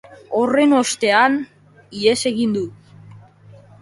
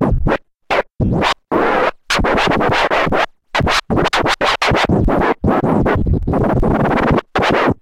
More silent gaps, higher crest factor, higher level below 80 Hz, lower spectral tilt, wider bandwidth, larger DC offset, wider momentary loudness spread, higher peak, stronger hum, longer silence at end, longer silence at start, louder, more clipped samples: neither; about the same, 18 dB vs 14 dB; second, -62 dBFS vs -26 dBFS; second, -3.5 dB/octave vs -5.5 dB/octave; second, 11.5 kHz vs 16 kHz; neither; first, 13 LU vs 5 LU; about the same, -2 dBFS vs 0 dBFS; neither; first, 0.65 s vs 0.05 s; about the same, 0.1 s vs 0 s; about the same, -17 LUFS vs -15 LUFS; neither